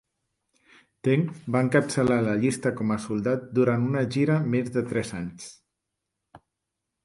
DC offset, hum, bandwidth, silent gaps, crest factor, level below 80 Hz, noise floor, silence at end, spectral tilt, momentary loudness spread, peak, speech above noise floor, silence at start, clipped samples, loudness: under 0.1%; none; 11.5 kHz; none; 20 dB; -58 dBFS; -83 dBFS; 0.7 s; -7 dB/octave; 9 LU; -6 dBFS; 59 dB; 1.05 s; under 0.1%; -25 LUFS